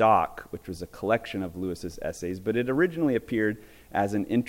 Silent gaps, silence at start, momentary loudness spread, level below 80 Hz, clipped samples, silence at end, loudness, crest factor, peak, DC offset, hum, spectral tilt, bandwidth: none; 0 s; 13 LU; -54 dBFS; under 0.1%; 0 s; -28 LUFS; 18 dB; -8 dBFS; under 0.1%; none; -6.5 dB/octave; 17 kHz